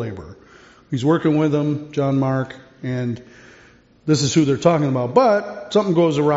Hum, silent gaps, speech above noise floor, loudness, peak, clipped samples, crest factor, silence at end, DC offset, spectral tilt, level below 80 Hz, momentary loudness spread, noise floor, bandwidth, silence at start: none; none; 32 dB; -19 LUFS; -2 dBFS; under 0.1%; 18 dB; 0 s; under 0.1%; -6.5 dB/octave; -56 dBFS; 14 LU; -50 dBFS; 8 kHz; 0 s